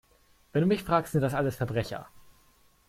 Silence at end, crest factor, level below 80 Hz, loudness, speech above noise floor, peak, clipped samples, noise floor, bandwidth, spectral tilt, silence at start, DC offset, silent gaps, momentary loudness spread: 0.7 s; 18 dB; -56 dBFS; -28 LUFS; 35 dB; -12 dBFS; under 0.1%; -63 dBFS; 16 kHz; -7 dB/octave; 0.55 s; under 0.1%; none; 8 LU